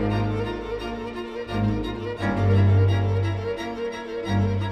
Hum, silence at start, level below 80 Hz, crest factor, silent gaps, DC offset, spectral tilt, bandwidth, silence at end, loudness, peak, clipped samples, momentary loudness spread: none; 0 s; -40 dBFS; 14 dB; none; under 0.1%; -8 dB/octave; 6.2 kHz; 0 s; -25 LUFS; -8 dBFS; under 0.1%; 12 LU